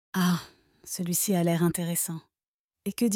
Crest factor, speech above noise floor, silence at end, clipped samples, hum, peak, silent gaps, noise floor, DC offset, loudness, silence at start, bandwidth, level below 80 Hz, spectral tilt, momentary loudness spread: 16 dB; over 63 dB; 0 s; under 0.1%; none; -14 dBFS; 2.48-2.68 s; under -90 dBFS; under 0.1%; -28 LUFS; 0.15 s; 17.5 kHz; -66 dBFS; -5 dB/octave; 13 LU